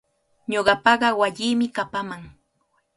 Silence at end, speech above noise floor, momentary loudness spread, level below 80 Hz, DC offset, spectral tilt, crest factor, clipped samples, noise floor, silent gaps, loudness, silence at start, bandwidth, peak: 0.7 s; 48 dB; 17 LU; -58 dBFS; under 0.1%; -4 dB/octave; 22 dB; under 0.1%; -69 dBFS; none; -21 LUFS; 0.5 s; 11.5 kHz; -2 dBFS